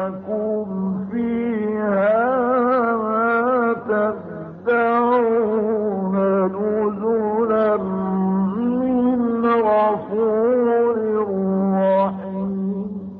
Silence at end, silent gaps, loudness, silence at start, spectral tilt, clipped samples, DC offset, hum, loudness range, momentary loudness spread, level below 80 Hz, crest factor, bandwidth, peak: 0 s; none; -20 LUFS; 0 s; -7.5 dB/octave; under 0.1%; under 0.1%; none; 1 LU; 7 LU; -56 dBFS; 12 dB; 4.4 kHz; -8 dBFS